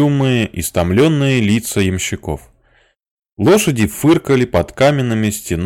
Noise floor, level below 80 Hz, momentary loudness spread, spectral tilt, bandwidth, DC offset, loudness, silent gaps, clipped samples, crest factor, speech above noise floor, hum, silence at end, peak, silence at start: -56 dBFS; -38 dBFS; 7 LU; -5.5 dB/octave; 17 kHz; under 0.1%; -15 LUFS; 3.11-3.18 s, 3.32-3.36 s; under 0.1%; 10 dB; 42 dB; none; 0 s; -4 dBFS; 0 s